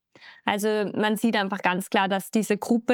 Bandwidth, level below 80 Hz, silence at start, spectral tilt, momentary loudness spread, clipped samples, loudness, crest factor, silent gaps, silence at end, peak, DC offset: 19 kHz; -78 dBFS; 0.2 s; -4.5 dB/octave; 2 LU; under 0.1%; -25 LUFS; 20 dB; none; 0 s; -6 dBFS; under 0.1%